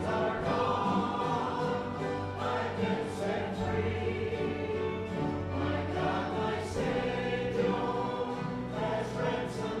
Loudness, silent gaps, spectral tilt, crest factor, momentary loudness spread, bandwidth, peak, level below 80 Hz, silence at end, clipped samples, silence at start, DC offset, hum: -32 LUFS; none; -6.5 dB/octave; 14 dB; 4 LU; 12.5 kHz; -18 dBFS; -54 dBFS; 0 s; under 0.1%; 0 s; under 0.1%; none